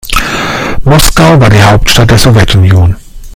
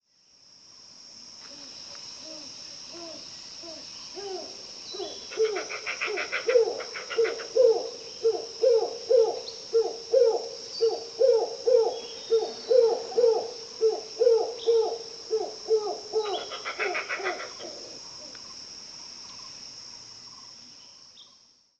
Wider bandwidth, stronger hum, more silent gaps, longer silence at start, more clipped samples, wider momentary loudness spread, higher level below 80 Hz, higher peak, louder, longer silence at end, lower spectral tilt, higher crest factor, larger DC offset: first, over 20 kHz vs 8.2 kHz; neither; neither; second, 0.05 s vs 0.85 s; first, 6% vs under 0.1%; second, 8 LU vs 18 LU; first, -16 dBFS vs -74 dBFS; first, 0 dBFS vs -10 dBFS; first, -5 LUFS vs -27 LUFS; second, 0 s vs 0.55 s; first, -5 dB/octave vs -1.5 dB/octave; second, 4 dB vs 18 dB; neither